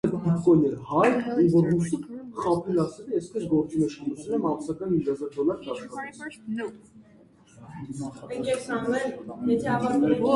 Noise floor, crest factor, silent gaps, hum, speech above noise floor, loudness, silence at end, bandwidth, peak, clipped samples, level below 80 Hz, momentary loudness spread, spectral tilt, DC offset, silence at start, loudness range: -55 dBFS; 18 dB; none; none; 30 dB; -26 LUFS; 0 s; 11.5 kHz; -8 dBFS; under 0.1%; -58 dBFS; 15 LU; -7.5 dB/octave; under 0.1%; 0.05 s; 10 LU